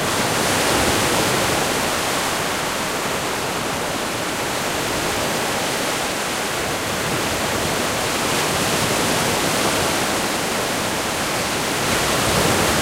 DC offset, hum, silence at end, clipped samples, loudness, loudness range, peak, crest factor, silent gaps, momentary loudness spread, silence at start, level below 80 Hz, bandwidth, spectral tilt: under 0.1%; none; 0 s; under 0.1%; -19 LUFS; 2 LU; -6 dBFS; 16 dB; none; 5 LU; 0 s; -42 dBFS; 16 kHz; -2.5 dB/octave